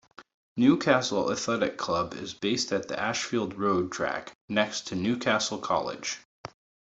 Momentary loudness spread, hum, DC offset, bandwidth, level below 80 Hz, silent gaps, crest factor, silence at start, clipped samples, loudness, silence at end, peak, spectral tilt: 11 LU; none; under 0.1%; 8.2 kHz; -64 dBFS; 0.34-0.56 s, 4.35-4.48 s, 6.25-6.44 s; 24 dB; 0.2 s; under 0.1%; -28 LUFS; 0.4 s; -4 dBFS; -4 dB/octave